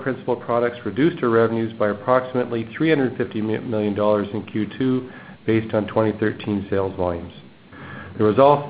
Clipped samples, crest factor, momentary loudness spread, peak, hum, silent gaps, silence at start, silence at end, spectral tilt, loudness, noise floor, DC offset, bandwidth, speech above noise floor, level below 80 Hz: under 0.1%; 20 dB; 9 LU; 0 dBFS; none; none; 0 s; 0 s; -12 dB/octave; -22 LUFS; -40 dBFS; under 0.1%; 5 kHz; 20 dB; -50 dBFS